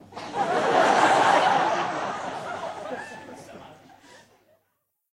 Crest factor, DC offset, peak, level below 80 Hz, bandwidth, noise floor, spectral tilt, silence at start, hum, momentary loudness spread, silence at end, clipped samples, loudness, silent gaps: 18 dB; under 0.1%; -8 dBFS; -70 dBFS; 13.5 kHz; -75 dBFS; -3.5 dB/octave; 0.1 s; none; 22 LU; 1.4 s; under 0.1%; -23 LUFS; none